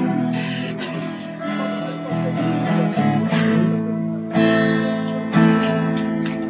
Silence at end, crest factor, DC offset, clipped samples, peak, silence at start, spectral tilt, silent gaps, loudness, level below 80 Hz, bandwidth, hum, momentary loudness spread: 0 s; 16 dB; under 0.1%; under 0.1%; -4 dBFS; 0 s; -11 dB/octave; none; -20 LUFS; -56 dBFS; 4 kHz; none; 10 LU